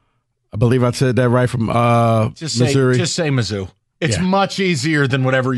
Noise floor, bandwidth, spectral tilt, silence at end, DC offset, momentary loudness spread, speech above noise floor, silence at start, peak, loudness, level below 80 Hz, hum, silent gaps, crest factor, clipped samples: -66 dBFS; 12 kHz; -5.5 dB/octave; 0 s; under 0.1%; 6 LU; 51 dB; 0.55 s; -2 dBFS; -16 LUFS; -46 dBFS; none; none; 14 dB; under 0.1%